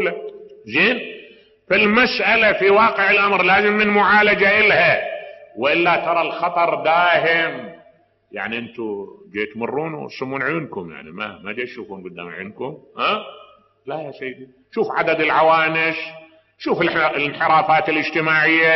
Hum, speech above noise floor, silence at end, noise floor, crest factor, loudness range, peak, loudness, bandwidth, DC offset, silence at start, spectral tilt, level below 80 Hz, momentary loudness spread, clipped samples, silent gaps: none; 36 dB; 0 s; -54 dBFS; 14 dB; 13 LU; -4 dBFS; -17 LUFS; 6 kHz; under 0.1%; 0 s; -1.5 dB/octave; -56 dBFS; 18 LU; under 0.1%; none